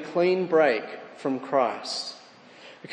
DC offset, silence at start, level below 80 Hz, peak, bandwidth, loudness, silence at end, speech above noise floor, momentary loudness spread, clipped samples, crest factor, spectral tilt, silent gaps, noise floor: under 0.1%; 0 s; -84 dBFS; -8 dBFS; 10 kHz; -25 LUFS; 0 s; 24 dB; 17 LU; under 0.1%; 18 dB; -4.5 dB/octave; none; -49 dBFS